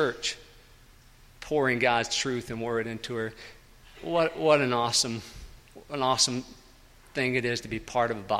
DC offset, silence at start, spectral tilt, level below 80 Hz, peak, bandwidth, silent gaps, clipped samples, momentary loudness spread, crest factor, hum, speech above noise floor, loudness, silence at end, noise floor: under 0.1%; 0 s; -3 dB/octave; -54 dBFS; -6 dBFS; 16 kHz; none; under 0.1%; 19 LU; 22 dB; none; 27 dB; -27 LUFS; 0 s; -55 dBFS